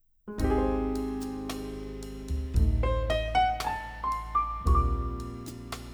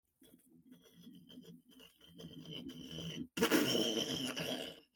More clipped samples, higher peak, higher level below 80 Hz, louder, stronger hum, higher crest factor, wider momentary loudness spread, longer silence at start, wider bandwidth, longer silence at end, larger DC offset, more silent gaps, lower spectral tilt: neither; first, -14 dBFS vs -18 dBFS; first, -32 dBFS vs -74 dBFS; first, -30 LUFS vs -37 LUFS; neither; second, 16 dB vs 24 dB; second, 13 LU vs 27 LU; about the same, 0.25 s vs 0.2 s; first, over 20 kHz vs 18 kHz; second, 0 s vs 0.15 s; neither; neither; first, -6.5 dB/octave vs -3.5 dB/octave